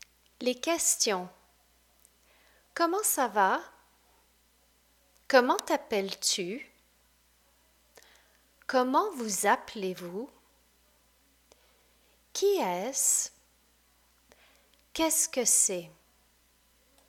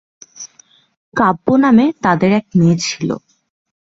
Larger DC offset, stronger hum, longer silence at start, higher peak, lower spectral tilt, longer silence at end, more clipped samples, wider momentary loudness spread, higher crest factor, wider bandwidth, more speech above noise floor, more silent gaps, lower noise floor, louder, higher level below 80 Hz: neither; first, 60 Hz at -70 dBFS vs none; about the same, 0.4 s vs 0.4 s; second, -8 dBFS vs 0 dBFS; second, -1.5 dB/octave vs -6 dB/octave; first, 1.2 s vs 0.8 s; neither; second, 16 LU vs 22 LU; first, 24 dB vs 16 dB; first, 19 kHz vs 7.8 kHz; about the same, 38 dB vs 37 dB; second, none vs 0.97-1.12 s; first, -67 dBFS vs -51 dBFS; second, -28 LUFS vs -14 LUFS; second, -70 dBFS vs -52 dBFS